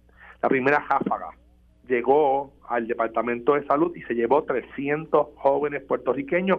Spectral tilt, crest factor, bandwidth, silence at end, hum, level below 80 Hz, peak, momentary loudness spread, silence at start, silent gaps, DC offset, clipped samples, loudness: -8.5 dB/octave; 18 dB; 5.8 kHz; 0 s; none; -58 dBFS; -6 dBFS; 8 LU; 0.25 s; none; under 0.1%; under 0.1%; -24 LUFS